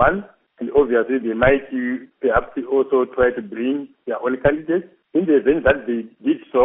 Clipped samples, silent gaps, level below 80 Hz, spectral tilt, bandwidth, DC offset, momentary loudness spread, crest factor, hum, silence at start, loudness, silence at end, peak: under 0.1%; none; -40 dBFS; -5 dB/octave; 3.8 kHz; under 0.1%; 8 LU; 18 dB; none; 0 s; -20 LUFS; 0 s; 0 dBFS